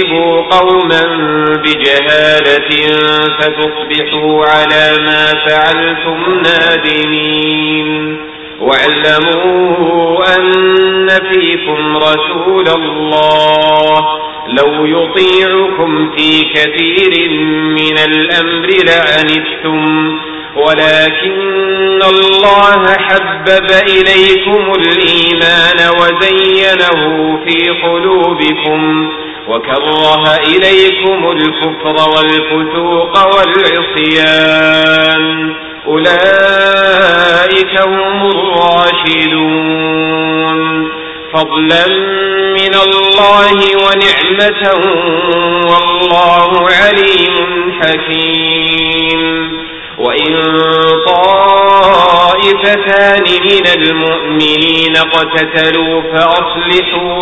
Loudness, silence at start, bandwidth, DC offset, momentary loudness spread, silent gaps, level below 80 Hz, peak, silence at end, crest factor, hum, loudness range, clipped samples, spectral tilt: -8 LUFS; 0 s; 8 kHz; 0.5%; 6 LU; none; -42 dBFS; 0 dBFS; 0 s; 8 dB; none; 3 LU; 0.8%; -5 dB/octave